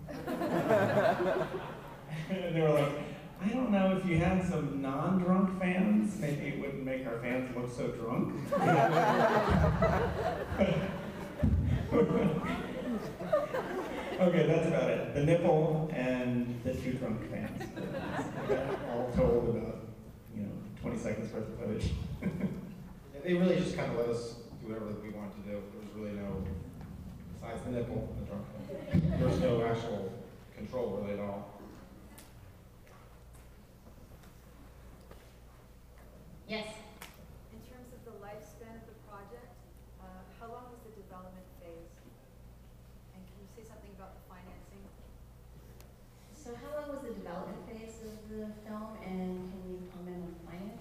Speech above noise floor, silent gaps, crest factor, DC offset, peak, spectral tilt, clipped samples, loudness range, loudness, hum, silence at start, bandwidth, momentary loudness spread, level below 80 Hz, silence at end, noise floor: 23 dB; none; 20 dB; under 0.1%; -14 dBFS; -7.5 dB/octave; under 0.1%; 22 LU; -33 LUFS; none; 0 s; 15.5 kHz; 24 LU; -50 dBFS; 0 s; -56 dBFS